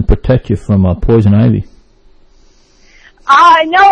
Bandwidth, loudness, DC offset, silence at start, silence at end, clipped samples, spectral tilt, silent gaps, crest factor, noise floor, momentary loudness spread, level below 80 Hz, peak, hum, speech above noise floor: 8.8 kHz; -9 LUFS; under 0.1%; 0 s; 0 s; 0.7%; -7 dB/octave; none; 10 dB; -45 dBFS; 8 LU; -22 dBFS; 0 dBFS; none; 37 dB